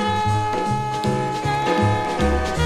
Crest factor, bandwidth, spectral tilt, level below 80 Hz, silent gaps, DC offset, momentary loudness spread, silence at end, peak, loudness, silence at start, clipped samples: 14 dB; 13.5 kHz; -6 dB/octave; -32 dBFS; none; under 0.1%; 3 LU; 0 s; -6 dBFS; -21 LUFS; 0 s; under 0.1%